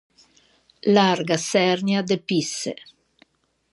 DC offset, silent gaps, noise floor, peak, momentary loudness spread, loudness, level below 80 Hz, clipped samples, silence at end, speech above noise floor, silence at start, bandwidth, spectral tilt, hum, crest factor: under 0.1%; none; -61 dBFS; -2 dBFS; 11 LU; -21 LUFS; -70 dBFS; under 0.1%; 1 s; 40 dB; 0.85 s; 11.5 kHz; -4.5 dB/octave; none; 20 dB